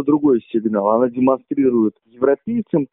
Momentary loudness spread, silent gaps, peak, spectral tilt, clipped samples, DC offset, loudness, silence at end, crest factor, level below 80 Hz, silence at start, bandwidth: 5 LU; none; -2 dBFS; -8.5 dB/octave; under 0.1%; under 0.1%; -18 LUFS; 0.1 s; 16 dB; -58 dBFS; 0 s; 3.9 kHz